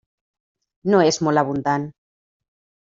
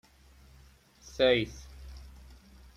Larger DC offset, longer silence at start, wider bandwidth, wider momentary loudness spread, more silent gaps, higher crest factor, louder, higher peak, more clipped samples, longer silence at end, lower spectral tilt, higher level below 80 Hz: neither; second, 0.85 s vs 1.15 s; second, 7.8 kHz vs 13.5 kHz; second, 11 LU vs 25 LU; neither; about the same, 20 dB vs 24 dB; first, -20 LUFS vs -28 LUFS; first, -4 dBFS vs -12 dBFS; neither; first, 0.95 s vs 0.7 s; about the same, -5 dB/octave vs -5 dB/octave; second, -62 dBFS vs -52 dBFS